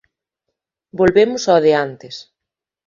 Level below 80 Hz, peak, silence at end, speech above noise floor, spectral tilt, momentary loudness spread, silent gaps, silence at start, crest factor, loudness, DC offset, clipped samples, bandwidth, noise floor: -50 dBFS; 0 dBFS; 0.65 s; 69 dB; -5 dB/octave; 20 LU; none; 0.95 s; 18 dB; -15 LUFS; under 0.1%; under 0.1%; 7.6 kHz; -84 dBFS